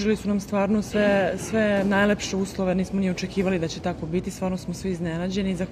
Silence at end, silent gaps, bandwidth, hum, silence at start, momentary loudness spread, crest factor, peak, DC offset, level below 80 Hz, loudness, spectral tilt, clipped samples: 0 s; none; 14.5 kHz; none; 0 s; 8 LU; 14 dB; -10 dBFS; under 0.1%; -46 dBFS; -25 LUFS; -6 dB/octave; under 0.1%